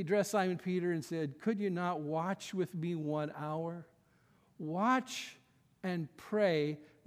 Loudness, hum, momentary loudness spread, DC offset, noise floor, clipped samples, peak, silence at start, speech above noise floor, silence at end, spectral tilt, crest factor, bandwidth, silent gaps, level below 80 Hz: -36 LUFS; none; 11 LU; under 0.1%; -69 dBFS; under 0.1%; -18 dBFS; 0 s; 34 dB; 0.2 s; -6 dB/octave; 18 dB; 16 kHz; none; -82 dBFS